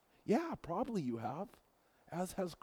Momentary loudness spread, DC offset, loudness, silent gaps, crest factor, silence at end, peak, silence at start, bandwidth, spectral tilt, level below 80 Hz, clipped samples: 11 LU; under 0.1%; -40 LUFS; none; 18 dB; 0.1 s; -22 dBFS; 0.25 s; over 20 kHz; -6.5 dB/octave; -68 dBFS; under 0.1%